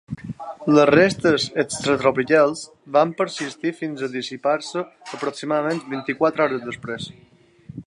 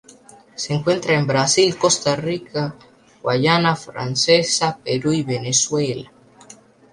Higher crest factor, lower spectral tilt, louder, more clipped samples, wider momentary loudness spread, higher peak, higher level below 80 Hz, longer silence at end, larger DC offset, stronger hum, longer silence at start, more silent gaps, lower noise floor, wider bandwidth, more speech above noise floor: about the same, 20 dB vs 18 dB; first, -5 dB/octave vs -3.5 dB/octave; about the same, -21 LUFS vs -19 LUFS; neither; first, 16 LU vs 10 LU; about the same, -2 dBFS vs -2 dBFS; about the same, -58 dBFS vs -58 dBFS; second, 0.05 s vs 0.4 s; neither; neither; second, 0.1 s vs 0.6 s; neither; second, -40 dBFS vs -47 dBFS; about the same, 11.5 kHz vs 11.5 kHz; second, 19 dB vs 28 dB